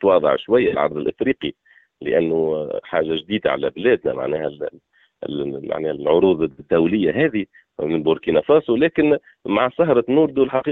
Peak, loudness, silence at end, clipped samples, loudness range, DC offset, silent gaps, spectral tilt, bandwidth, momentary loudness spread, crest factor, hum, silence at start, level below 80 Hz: -4 dBFS; -19 LUFS; 0 s; under 0.1%; 4 LU; under 0.1%; none; -4.5 dB/octave; 4.1 kHz; 11 LU; 16 dB; none; 0 s; -54 dBFS